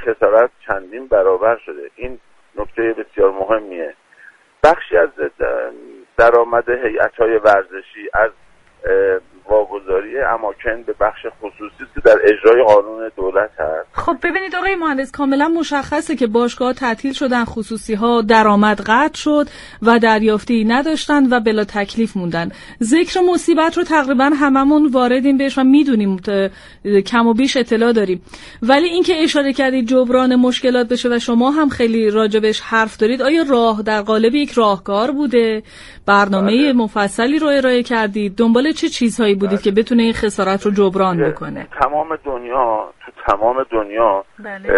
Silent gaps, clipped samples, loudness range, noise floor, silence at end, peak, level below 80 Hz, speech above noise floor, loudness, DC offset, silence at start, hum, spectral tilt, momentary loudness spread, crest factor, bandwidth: none; under 0.1%; 4 LU; -46 dBFS; 0 s; 0 dBFS; -42 dBFS; 31 dB; -15 LUFS; under 0.1%; 0 s; none; -5 dB/octave; 11 LU; 16 dB; 11.5 kHz